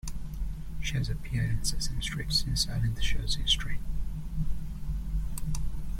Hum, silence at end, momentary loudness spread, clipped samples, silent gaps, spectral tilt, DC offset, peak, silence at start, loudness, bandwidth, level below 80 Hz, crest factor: none; 0 s; 11 LU; under 0.1%; none; -3.5 dB/octave; under 0.1%; -12 dBFS; 0.05 s; -32 LUFS; 16 kHz; -34 dBFS; 16 dB